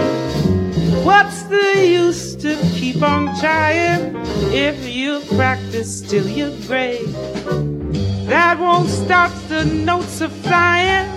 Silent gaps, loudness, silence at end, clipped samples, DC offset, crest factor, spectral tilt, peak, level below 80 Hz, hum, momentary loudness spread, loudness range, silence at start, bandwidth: none; -16 LUFS; 0 s; under 0.1%; under 0.1%; 16 dB; -5.5 dB/octave; 0 dBFS; -38 dBFS; none; 9 LU; 4 LU; 0 s; 14 kHz